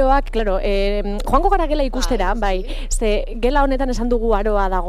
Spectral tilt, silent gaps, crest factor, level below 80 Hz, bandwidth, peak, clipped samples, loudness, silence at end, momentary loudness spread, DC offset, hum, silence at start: -5 dB/octave; none; 16 dB; -20 dBFS; 12.5 kHz; -2 dBFS; under 0.1%; -20 LUFS; 0 s; 5 LU; under 0.1%; none; 0 s